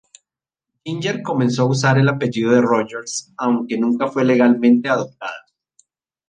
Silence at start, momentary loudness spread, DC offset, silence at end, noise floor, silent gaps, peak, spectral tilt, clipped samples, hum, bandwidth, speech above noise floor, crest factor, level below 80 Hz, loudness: 0.85 s; 14 LU; under 0.1%; 0.9 s; -86 dBFS; none; -2 dBFS; -6 dB/octave; under 0.1%; none; 9.6 kHz; 69 dB; 16 dB; -62 dBFS; -18 LUFS